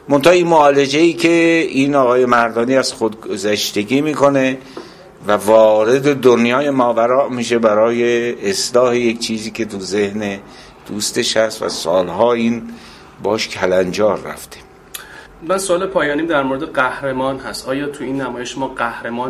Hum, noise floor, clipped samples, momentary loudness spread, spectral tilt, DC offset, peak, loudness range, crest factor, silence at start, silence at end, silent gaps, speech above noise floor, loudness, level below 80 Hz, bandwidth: none; -35 dBFS; under 0.1%; 13 LU; -4.5 dB/octave; under 0.1%; 0 dBFS; 6 LU; 16 dB; 0.05 s; 0 s; none; 20 dB; -15 LUFS; -50 dBFS; 15.5 kHz